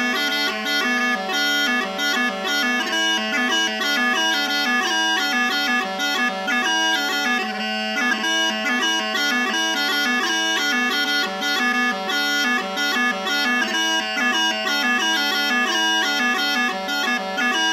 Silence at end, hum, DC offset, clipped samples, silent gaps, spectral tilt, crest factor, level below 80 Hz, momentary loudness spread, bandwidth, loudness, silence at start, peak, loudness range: 0 s; none; under 0.1%; under 0.1%; none; -1 dB/octave; 12 dB; -78 dBFS; 3 LU; 16 kHz; -19 LUFS; 0 s; -8 dBFS; 1 LU